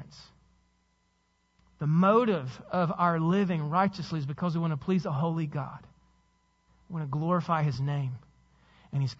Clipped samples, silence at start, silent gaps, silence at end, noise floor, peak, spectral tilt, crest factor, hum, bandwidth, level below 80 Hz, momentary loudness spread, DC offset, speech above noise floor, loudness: under 0.1%; 0 s; none; 0.05 s; -72 dBFS; -12 dBFS; -8.5 dB/octave; 18 dB; none; 7.4 kHz; -64 dBFS; 12 LU; under 0.1%; 44 dB; -29 LUFS